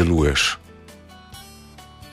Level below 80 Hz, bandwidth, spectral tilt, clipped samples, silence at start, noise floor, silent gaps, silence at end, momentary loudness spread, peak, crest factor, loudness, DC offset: -34 dBFS; 15.5 kHz; -4.5 dB/octave; under 0.1%; 0 s; -44 dBFS; none; 0.05 s; 26 LU; -6 dBFS; 18 dB; -20 LUFS; under 0.1%